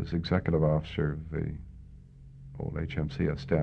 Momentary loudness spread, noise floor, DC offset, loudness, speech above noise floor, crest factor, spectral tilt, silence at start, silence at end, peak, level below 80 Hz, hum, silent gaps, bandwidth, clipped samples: 22 LU; -50 dBFS; under 0.1%; -31 LUFS; 20 dB; 20 dB; -9 dB/octave; 0 s; 0 s; -12 dBFS; -44 dBFS; none; none; 6.4 kHz; under 0.1%